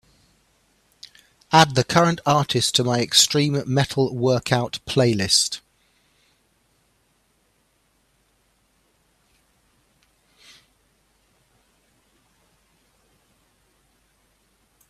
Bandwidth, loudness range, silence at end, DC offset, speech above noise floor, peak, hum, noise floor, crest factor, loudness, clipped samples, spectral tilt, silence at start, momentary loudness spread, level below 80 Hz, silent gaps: 14.5 kHz; 6 LU; 9.3 s; under 0.1%; 46 dB; 0 dBFS; none; -65 dBFS; 24 dB; -19 LUFS; under 0.1%; -3.5 dB/octave; 1.5 s; 7 LU; -58 dBFS; none